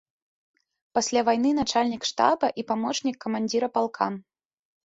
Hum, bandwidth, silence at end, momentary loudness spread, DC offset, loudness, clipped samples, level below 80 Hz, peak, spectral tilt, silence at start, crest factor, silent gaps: none; 8 kHz; 0.65 s; 7 LU; under 0.1%; -25 LUFS; under 0.1%; -62 dBFS; -6 dBFS; -3.5 dB/octave; 0.95 s; 20 dB; none